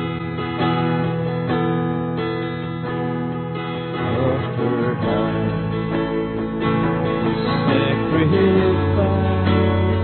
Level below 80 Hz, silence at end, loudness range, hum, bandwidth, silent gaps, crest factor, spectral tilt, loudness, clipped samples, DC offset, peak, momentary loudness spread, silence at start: -44 dBFS; 0 s; 5 LU; none; 4.4 kHz; none; 16 dB; -12.5 dB/octave; -20 LUFS; under 0.1%; under 0.1%; -4 dBFS; 8 LU; 0 s